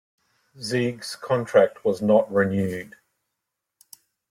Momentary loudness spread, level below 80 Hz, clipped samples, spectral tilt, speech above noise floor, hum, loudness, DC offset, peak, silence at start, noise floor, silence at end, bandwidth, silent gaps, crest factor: 15 LU; -64 dBFS; under 0.1%; -6 dB/octave; 60 dB; none; -23 LUFS; under 0.1%; -6 dBFS; 0.6 s; -82 dBFS; 1.45 s; 15.5 kHz; none; 20 dB